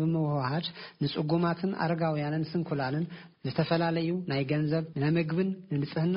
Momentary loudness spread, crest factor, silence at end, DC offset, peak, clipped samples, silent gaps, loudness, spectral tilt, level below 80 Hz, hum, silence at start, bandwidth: 6 LU; 16 dB; 0 s; under 0.1%; -14 dBFS; under 0.1%; none; -30 LUFS; -6 dB/octave; -64 dBFS; none; 0 s; 5.4 kHz